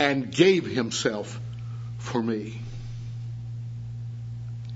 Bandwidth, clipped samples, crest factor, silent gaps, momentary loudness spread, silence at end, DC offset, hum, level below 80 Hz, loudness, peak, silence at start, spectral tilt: 8 kHz; under 0.1%; 22 dB; none; 16 LU; 0 s; under 0.1%; 60 Hz at -55 dBFS; -52 dBFS; -28 LUFS; -4 dBFS; 0 s; -5 dB/octave